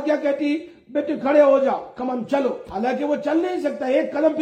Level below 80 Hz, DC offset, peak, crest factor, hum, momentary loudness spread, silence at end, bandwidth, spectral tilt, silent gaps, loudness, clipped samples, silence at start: -62 dBFS; under 0.1%; -4 dBFS; 16 dB; none; 11 LU; 0 s; 9 kHz; -6 dB/octave; none; -21 LUFS; under 0.1%; 0 s